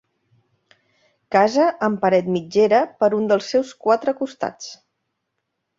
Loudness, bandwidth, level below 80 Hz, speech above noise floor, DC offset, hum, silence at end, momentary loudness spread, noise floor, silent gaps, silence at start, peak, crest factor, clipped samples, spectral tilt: -19 LUFS; 7.8 kHz; -66 dBFS; 58 dB; under 0.1%; none; 1.05 s; 11 LU; -77 dBFS; none; 1.3 s; -2 dBFS; 18 dB; under 0.1%; -5.5 dB/octave